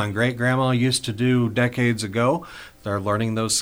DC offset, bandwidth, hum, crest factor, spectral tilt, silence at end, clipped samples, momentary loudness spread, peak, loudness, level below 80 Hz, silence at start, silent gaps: under 0.1%; over 20 kHz; none; 16 dB; -5 dB/octave; 0 s; under 0.1%; 8 LU; -6 dBFS; -22 LUFS; -54 dBFS; 0 s; none